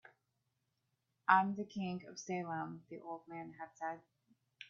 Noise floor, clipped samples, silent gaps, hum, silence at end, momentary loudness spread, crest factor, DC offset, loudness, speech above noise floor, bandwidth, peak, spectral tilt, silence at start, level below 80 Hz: -84 dBFS; under 0.1%; none; none; 0.05 s; 19 LU; 26 dB; under 0.1%; -39 LUFS; 45 dB; 7.2 kHz; -14 dBFS; -4 dB/octave; 1.3 s; -84 dBFS